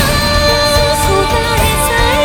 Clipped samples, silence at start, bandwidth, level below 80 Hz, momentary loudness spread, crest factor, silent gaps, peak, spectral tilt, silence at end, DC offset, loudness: under 0.1%; 0 s; over 20 kHz; -20 dBFS; 2 LU; 12 dB; none; 0 dBFS; -3.5 dB/octave; 0 s; under 0.1%; -11 LUFS